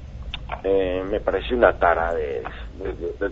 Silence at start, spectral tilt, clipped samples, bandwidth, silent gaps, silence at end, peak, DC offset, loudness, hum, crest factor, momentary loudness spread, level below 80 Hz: 0 s; -7.5 dB/octave; under 0.1%; 7.4 kHz; none; 0 s; -2 dBFS; under 0.1%; -23 LUFS; none; 22 dB; 15 LU; -36 dBFS